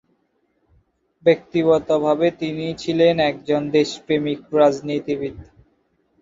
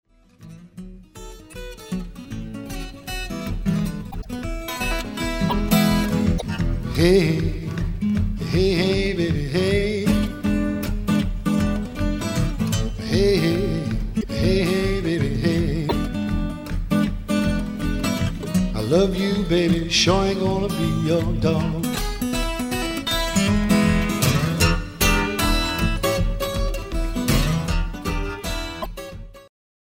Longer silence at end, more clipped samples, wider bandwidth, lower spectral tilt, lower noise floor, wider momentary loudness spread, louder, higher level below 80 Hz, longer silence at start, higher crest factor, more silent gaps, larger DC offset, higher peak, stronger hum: first, 0.8 s vs 0.5 s; neither; second, 7.8 kHz vs 16.5 kHz; about the same, -6 dB/octave vs -5.5 dB/octave; first, -67 dBFS vs -45 dBFS; second, 9 LU vs 13 LU; about the same, -20 LUFS vs -22 LUFS; second, -56 dBFS vs -30 dBFS; first, 1.25 s vs 0.4 s; about the same, 18 dB vs 18 dB; neither; neither; about the same, -2 dBFS vs -4 dBFS; neither